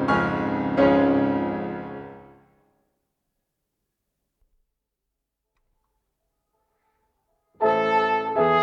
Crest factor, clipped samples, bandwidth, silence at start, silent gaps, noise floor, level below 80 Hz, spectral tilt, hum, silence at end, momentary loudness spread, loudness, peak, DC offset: 20 dB; under 0.1%; 7 kHz; 0 s; none; -82 dBFS; -56 dBFS; -7.5 dB/octave; none; 0 s; 16 LU; -22 LUFS; -6 dBFS; under 0.1%